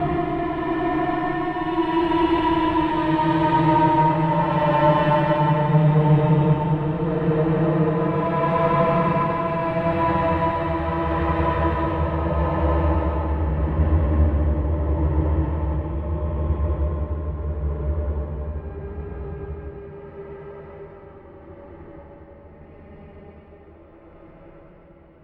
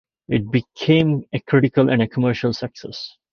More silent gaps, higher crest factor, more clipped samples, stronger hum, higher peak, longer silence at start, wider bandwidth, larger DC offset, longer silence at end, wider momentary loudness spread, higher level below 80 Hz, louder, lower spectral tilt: neither; about the same, 16 dB vs 18 dB; neither; neither; about the same, -4 dBFS vs -2 dBFS; second, 0 s vs 0.3 s; second, 4.7 kHz vs 6.8 kHz; neither; first, 0.65 s vs 0.25 s; about the same, 16 LU vs 14 LU; first, -30 dBFS vs -52 dBFS; about the same, -21 LUFS vs -19 LUFS; first, -10 dB/octave vs -7.5 dB/octave